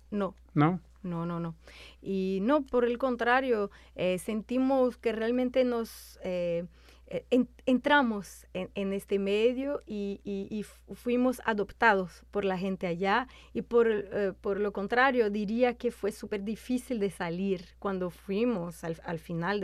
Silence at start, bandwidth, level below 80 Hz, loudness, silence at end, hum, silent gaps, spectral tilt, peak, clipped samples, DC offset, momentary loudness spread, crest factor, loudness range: 0.1 s; 14.5 kHz; -56 dBFS; -30 LUFS; 0 s; none; none; -6.5 dB/octave; -10 dBFS; under 0.1%; under 0.1%; 13 LU; 20 dB; 3 LU